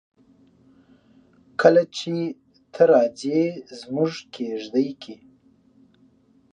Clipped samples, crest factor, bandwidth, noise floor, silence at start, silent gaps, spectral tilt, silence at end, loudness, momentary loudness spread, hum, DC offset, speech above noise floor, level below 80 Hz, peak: under 0.1%; 22 dB; 9.4 kHz; -58 dBFS; 1.6 s; none; -6 dB/octave; 1.4 s; -22 LUFS; 21 LU; none; under 0.1%; 37 dB; -74 dBFS; -2 dBFS